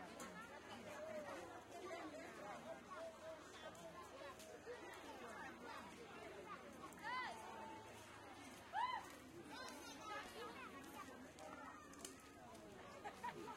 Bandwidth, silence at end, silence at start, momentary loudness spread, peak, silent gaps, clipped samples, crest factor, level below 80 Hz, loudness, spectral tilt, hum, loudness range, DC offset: 16 kHz; 0 s; 0 s; 9 LU; -34 dBFS; none; under 0.1%; 22 dB; -80 dBFS; -54 LUFS; -3.5 dB/octave; none; 4 LU; under 0.1%